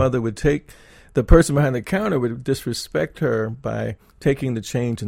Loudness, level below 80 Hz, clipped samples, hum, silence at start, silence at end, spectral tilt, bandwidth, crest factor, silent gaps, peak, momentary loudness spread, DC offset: -21 LUFS; -30 dBFS; under 0.1%; none; 0 s; 0 s; -6.5 dB/octave; 16.5 kHz; 20 dB; none; 0 dBFS; 11 LU; under 0.1%